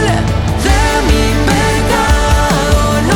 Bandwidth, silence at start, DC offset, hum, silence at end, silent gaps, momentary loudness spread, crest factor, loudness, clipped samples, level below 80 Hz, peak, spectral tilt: 18 kHz; 0 s; under 0.1%; none; 0 s; none; 2 LU; 10 dB; -12 LUFS; under 0.1%; -16 dBFS; 0 dBFS; -5 dB/octave